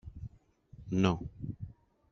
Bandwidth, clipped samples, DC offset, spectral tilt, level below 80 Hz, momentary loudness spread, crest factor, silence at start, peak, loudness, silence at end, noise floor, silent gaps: 7.2 kHz; under 0.1%; under 0.1%; -6.5 dB/octave; -54 dBFS; 20 LU; 26 dB; 0.05 s; -10 dBFS; -34 LUFS; 0.4 s; -60 dBFS; none